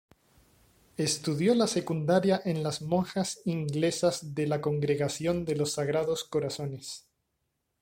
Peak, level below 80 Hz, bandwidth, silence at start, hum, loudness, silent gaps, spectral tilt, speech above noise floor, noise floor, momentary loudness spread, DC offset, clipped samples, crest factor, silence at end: -12 dBFS; -62 dBFS; 16.5 kHz; 1 s; none; -29 LUFS; none; -5 dB/octave; 51 dB; -80 dBFS; 8 LU; under 0.1%; under 0.1%; 18 dB; 0.8 s